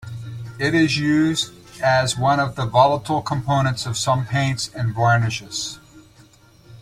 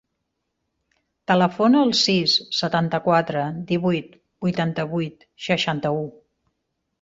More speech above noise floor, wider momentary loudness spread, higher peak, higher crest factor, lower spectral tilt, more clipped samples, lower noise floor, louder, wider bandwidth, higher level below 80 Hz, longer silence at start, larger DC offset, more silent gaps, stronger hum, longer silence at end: second, 31 dB vs 56 dB; about the same, 10 LU vs 11 LU; about the same, -2 dBFS vs -4 dBFS; about the same, 18 dB vs 18 dB; about the same, -5 dB/octave vs -5 dB/octave; neither; second, -50 dBFS vs -77 dBFS; about the same, -20 LUFS vs -21 LUFS; first, 14.5 kHz vs 7.8 kHz; first, -50 dBFS vs -62 dBFS; second, 0 s vs 1.3 s; neither; neither; neither; second, 0.05 s vs 0.9 s